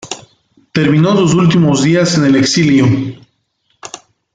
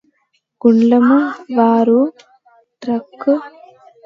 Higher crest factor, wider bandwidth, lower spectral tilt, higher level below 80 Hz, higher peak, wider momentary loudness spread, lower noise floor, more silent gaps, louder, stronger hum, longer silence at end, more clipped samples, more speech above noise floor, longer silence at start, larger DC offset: about the same, 12 dB vs 16 dB; first, 9.4 kHz vs 6 kHz; second, -5.5 dB/octave vs -8 dB/octave; first, -48 dBFS vs -68 dBFS; about the same, 0 dBFS vs 0 dBFS; first, 17 LU vs 11 LU; about the same, -62 dBFS vs -65 dBFS; neither; first, -11 LUFS vs -14 LUFS; neither; second, 0.4 s vs 0.6 s; neither; about the same, 52 dB vs 52 dB; second, 0.05 s vs 0.65 s; neither